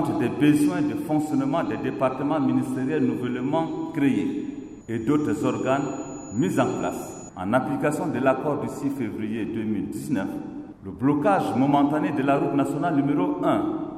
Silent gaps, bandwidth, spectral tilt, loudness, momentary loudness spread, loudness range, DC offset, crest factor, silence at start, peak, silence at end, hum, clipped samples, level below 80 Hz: none; 14.5 kHz; -7 dB/octave; -24 LUFS; 10 LU; 3 LU; under 0.1%; 16 dB; 0 s; -8 dBFS; 0 s; none; under 0.1%; -58 dBFS